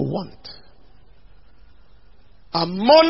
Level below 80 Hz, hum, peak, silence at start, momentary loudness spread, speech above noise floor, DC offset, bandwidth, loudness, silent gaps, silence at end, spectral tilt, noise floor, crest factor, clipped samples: -52 dBFS; none; 0 dBFS; 0 s; 23 LU; 35 dB; 0.7%; 5.8 kHz; -21 LUFS; none; 0 s; -9 dB/octave; -52 dBFS; 20 dB; under 0.1%